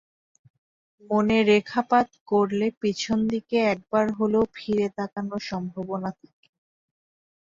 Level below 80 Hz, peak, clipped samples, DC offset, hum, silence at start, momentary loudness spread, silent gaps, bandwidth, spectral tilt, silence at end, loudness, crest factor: -60 dBFS; -6 dBFS; under 0.1%; under 0.1%; none; 1.1 s; 11 LU; 2.20-2.26 s, 2.77-2.81 s; 7.6 kHz; -6 dB/octave; 1.45 s; -25 LUFS; 18 dB